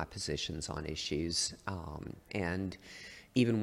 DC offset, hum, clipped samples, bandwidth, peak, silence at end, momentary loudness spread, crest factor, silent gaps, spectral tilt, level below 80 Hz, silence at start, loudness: under 0.1%; none; under 0.1%; 15 kHz; -16 dBFS; 0 s; 14 LU; 20 dB; none; -4 dB/octave; -54 dBFS; 0 s; -37 LUFS